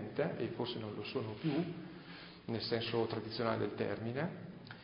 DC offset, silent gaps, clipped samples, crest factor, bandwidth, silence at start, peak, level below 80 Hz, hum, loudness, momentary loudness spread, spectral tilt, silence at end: under 0.1%; none; under 0.1%; 20 dB; 5.2 kHz; 0 s; -20 dBFS; -68 dBFS; none; -39 LUFS; 13 LU; -5 dB/octave; 0 s